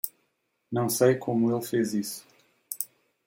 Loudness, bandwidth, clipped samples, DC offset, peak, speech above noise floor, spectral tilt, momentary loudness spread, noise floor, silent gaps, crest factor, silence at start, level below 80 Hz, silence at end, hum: -27 LUFS; 17 kHz; under 0.1%; under 0.1%; -8 dBFS; 50 dB; -5.5 dB/octave; 13 LU; -75 dBFS; none; 20 dB; 0.05 s; -72 dBFS; 0.4 s; none